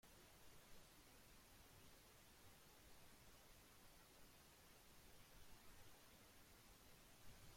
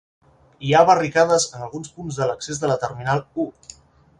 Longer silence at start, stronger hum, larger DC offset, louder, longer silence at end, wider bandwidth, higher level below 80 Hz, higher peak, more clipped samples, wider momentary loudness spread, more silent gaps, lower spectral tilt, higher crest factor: second, 0.05 s vs 0.6 s; neither; neither; second, -67 LUFS vs -20 LUFS; second, 0 s vs 0.7 s; first, 16.5 kHz vs 11.5 kHz; second, -74 dBFS vs -56 dBFS; second, -50 dBFS vs -2 dBFS; neither; second, 1 LU vs 16 LU; neither; second, -3 dB/octave vs -4.5 dB/octave; about the same, 16 dB vs 20 dB